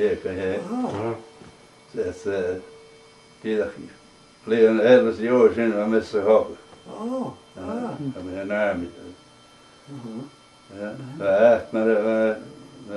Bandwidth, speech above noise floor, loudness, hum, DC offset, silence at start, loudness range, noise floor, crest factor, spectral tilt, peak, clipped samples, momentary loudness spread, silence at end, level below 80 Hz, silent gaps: 11.5 kHz; 29 dB; -22 LUFS; none; under 0.1%; 0 s; 11 LU; -51 dBFS; 22 dB; -6.5 dB/octave; -2 dBFS; under 0.1%; 21 LU; 0 s; -62 dBFS; none